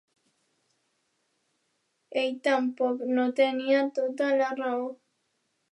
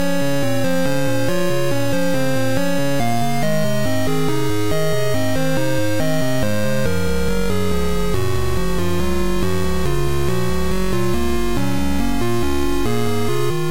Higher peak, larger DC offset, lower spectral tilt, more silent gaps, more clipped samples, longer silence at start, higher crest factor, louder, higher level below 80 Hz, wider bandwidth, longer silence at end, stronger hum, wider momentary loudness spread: second, -12 dBFS vs -4 dBFS; second, under 0.1% vs 10%; second, -4 dB/octave vs -5.5 dB/octave; neither; neither; first, 2.1 s vs 0 s; about the same, 18 dB vs 14 dB; second, -27 LUFS vs -20 LUFS; second, -88 dBFS vs -30 dBFS; second, 11 kHz vs 16 kHz; first, 0.75 s vs 0 s; neither; first, 6 LU vs 1 LU